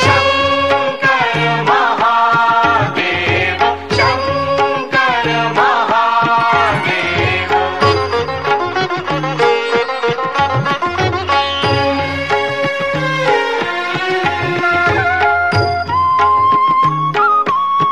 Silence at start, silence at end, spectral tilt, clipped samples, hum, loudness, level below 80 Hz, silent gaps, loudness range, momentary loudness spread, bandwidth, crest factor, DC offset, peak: 0 s; 0 s; -5 dB/octave; under 0.1%; none; -13 LUFS; -38 dBFS; none; 3 LU; 5 LU; 13 kHz; 14 dB; 0.8%; 0 dBFS